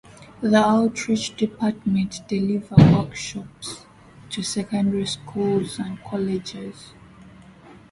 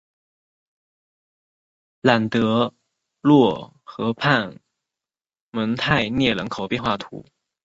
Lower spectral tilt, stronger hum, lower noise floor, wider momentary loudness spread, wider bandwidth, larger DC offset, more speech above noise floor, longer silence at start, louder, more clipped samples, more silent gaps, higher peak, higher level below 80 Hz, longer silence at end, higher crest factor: about the same, -6 dB/octave vs -6.5 dB/octave; neither; second, -47 dBFS vs under -90 dBFS; about the same, 18 LU vs 16 LU; first, 11.5 kHz vs 7.8 kHz; neither; second, 25 dB vs over 70 dB; second, 0.2 s vs 2.05 s; about the same, -22 LUFS vs -21 LUFS; neither; second, none vs 5.41-5.52 s; about the same, 0 dBFS vs -2 dBFS; first, -48 dBFS vs -54 dBFS; second, 0.2 s vs 0.45 s; about the same, 22 dB vs 22 dB